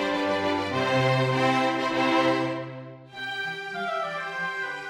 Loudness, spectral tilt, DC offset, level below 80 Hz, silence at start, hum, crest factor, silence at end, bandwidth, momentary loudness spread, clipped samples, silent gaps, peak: -26 LUFS; -5.5 dB/octave; under 0.1%; -66 dBFS; 0 s; none; 16 dB; 0 s; 13.5 kHz; 11 LU; under 0.1%; none; -10 dBFS